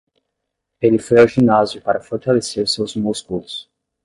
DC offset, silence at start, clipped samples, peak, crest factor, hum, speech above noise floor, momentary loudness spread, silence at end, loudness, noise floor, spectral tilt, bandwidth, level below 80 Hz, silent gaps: under 0.1%; 0.8 s; under 0.1%; -2 dBFS; 16 dB; none; 61 dB; 14 LU; 0.4 s; -17 LUFS; -77 dBFS; -5.5 dB/octave; 11.5 kHz; -52 dBFS; none